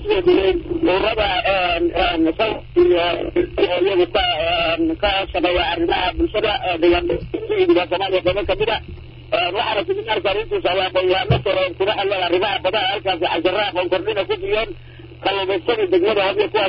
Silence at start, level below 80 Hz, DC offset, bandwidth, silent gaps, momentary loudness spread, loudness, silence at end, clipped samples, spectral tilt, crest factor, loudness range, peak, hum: 0 s; -38 dBFS; under 0.1%; 5.6 kHz; none; 5 LU; -18 LUFS; 0 s; under 0.1%; -10.5 dB/octave; 14 dB; 2 LU; -6 dBFS; none